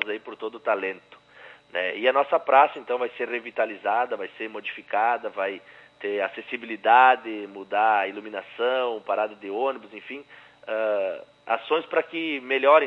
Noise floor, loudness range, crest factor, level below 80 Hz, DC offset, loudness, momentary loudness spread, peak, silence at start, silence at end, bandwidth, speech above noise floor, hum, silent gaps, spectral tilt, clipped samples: -49 dBFS; 5 LU; 20 dB; -78 dBFS; under 0.1%; -25 LUFS; 16 LU; -4 dBFS; 0 s; 0 s; 5.8 kHz; 25 dB; 60 Hz at -70 dBFS; none; -5 dB/octave; under 0.1%